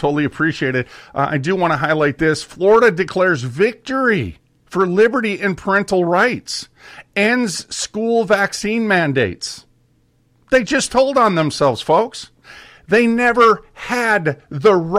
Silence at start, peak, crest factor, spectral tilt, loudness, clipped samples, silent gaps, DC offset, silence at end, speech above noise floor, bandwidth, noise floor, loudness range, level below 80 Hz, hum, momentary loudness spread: 0 s; -2 dBFS; 14 dB; -5 dB/octave; -16 LUFS; under 0.1%; none; under 0.1%; 0 s; 42 dB; 14 kHz; -58 dBFS; 2 LU; -50 dBFS; none; 10 LU